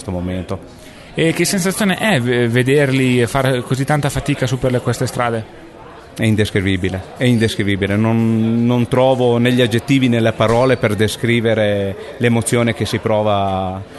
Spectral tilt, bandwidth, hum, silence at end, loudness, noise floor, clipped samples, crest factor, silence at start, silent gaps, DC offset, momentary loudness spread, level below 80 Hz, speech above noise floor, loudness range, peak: -5.5 dB/octave; 12.5 kHz; none; 0 s; -16 LUFS; -37 dBFS; under 0.1%; 14 dB; 0 s; none; under 0.1%; 7 LU; -42 dBFS; 21 dB; 4 LU; -2 dBFS